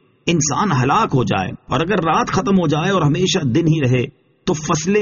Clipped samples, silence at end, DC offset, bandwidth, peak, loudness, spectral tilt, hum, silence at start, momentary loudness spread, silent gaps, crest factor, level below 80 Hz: under 0.1%; 0 s; under 0.1%; 7.4 kHz; -2 dBFS; -17 LUFS; -5.5 dB/octave; none; 0.25 s; 6 LU; none; 14 dB; -44 dBFS